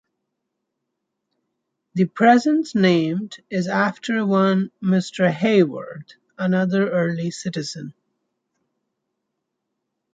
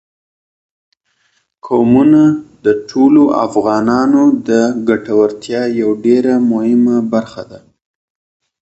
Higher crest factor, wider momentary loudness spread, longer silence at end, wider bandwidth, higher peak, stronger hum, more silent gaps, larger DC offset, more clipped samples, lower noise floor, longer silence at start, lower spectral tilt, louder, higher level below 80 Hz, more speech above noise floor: first, 20 dB vs 12 dB; first, 13 LU vs 8 LU; first, 2.25 s vs 1.05 s; about the same, 9 kHz vs 8.2 kHz; about the same, -2 dBFS vs 0 dBFS; neither; neither; neither; neither; first, -79 dBFS vs -61 dBFS; first, 1.95 s vs 1.65 s; about the same, -6.5 dB/octave vs -7 dB/octave; second, -20 LUFS vs -12 LUFS; second, -68 dBFS vs -52 dBFS; first, 59 dB vs 49 dB